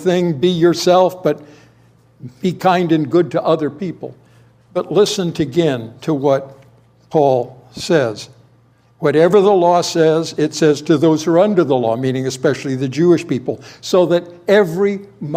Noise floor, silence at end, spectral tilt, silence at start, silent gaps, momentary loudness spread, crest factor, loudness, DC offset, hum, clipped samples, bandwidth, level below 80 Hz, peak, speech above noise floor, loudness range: -52 dBFS; 0 s; -6 dB/octave; 0 s; none; 11 LU; 16 dB; -16 LUFS; under 0.1%; none; under 0.1%; 15.5 kHz; -60 dBFS; 0 dBFS; 37 dB; 5 LU